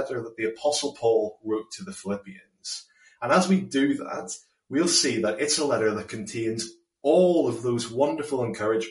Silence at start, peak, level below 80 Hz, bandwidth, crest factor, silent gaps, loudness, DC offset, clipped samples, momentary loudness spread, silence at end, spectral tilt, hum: 0 s; -8 dBFS; -68 dBFS; 11.5 kHz; 18 dB; none; -25 LUFS; under 0.1%; under 0.1%; 14 LU; 0 s; -4 dB/octave; none